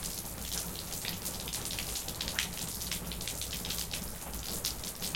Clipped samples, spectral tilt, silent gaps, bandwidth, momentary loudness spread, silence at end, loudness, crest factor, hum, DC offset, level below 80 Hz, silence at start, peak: under 0.1%; -2 dB/octave; none; 17 kHz; 3 LU; 0 s; -36 LUFS; 24 dB; none; under 0.1%; -48 dBFS; 0 s; -12 dBFS